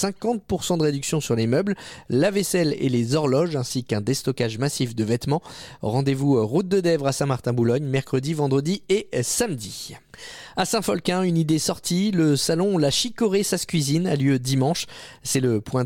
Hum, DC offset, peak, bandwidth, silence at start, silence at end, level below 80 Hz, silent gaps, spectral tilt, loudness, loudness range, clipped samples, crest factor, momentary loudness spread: none; under 0.1%; -10 dBFS; 17 kHz; 0 s; 0 s; -54 dBFS; none; -5 dB/octave; -23 LUFS; 3 LU; under 0.1%; 14 dB; 7 LU